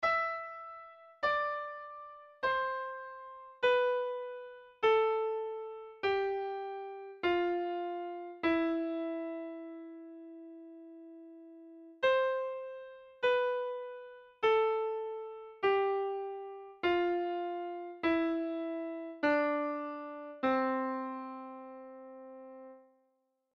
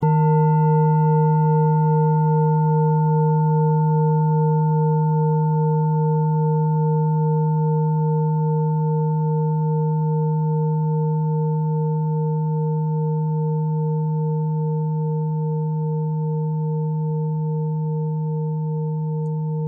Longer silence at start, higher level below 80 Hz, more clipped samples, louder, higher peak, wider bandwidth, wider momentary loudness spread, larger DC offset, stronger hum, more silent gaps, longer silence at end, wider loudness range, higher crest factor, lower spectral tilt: about the same, 0 s vs 0 s; about the same, -72 dBFS vs -70 dBFS; neither; second, -34 LUFS vs -20 LUFS; second, -18 dBFS vs -8 dBFS; first, 6.8 kHz vs 2.1 kHz; first, 20 LU vs 6 LU; neither; neither; neither; first, 0.75 s vs 0 s; about the same, 5 LU vs 5 LU; first, 16 dB vs 10 dB; second, -5.5 dB/octave vs -15 dB/octave